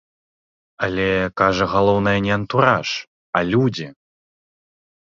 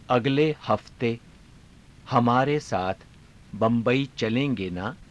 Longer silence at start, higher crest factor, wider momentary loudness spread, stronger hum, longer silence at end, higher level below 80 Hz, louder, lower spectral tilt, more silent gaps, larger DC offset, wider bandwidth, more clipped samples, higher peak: first, 0.8 s vs 0.1 s; about the same, 20 dB vs 18 dB; about the same, 9 LU vs 10 LU; neither; first, 1.1 s vs 0.05 s; first, -46 dBFS vs -54 dBFS; first, -19 LUFS vs -25 LUFS; about the same, -6 dB/octave vs -7 dB/octave; first, 3.07-3.33 s vs none; neither; second, 7.4 kHz vs 11 kHz; neither; first, -2 dBFS vs -8 dBFS